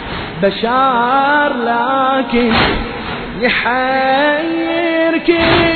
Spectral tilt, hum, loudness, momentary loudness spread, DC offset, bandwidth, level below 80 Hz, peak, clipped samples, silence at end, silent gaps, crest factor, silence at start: -8 dB/octave; none; -14 LUFS; 5 LU; under 0.1%; 4.6 kHz; -34 dBFS; 0 dBFS; under 0.1%; 0 s; none; 14 dB; 0 s